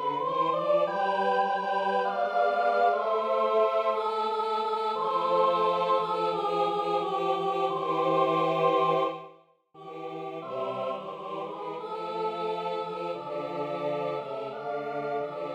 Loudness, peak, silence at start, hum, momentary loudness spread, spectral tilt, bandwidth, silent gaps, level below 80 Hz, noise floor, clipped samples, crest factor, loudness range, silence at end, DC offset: -28 LUFS; -12 dBFS; 0 s; none; 11 LU; -6 dB/octave; 9.6 kHz; none; -78 dBFS; -56 dBFS; under 0.1%; 16 dB; 7 LU; 0 s; under 0.1%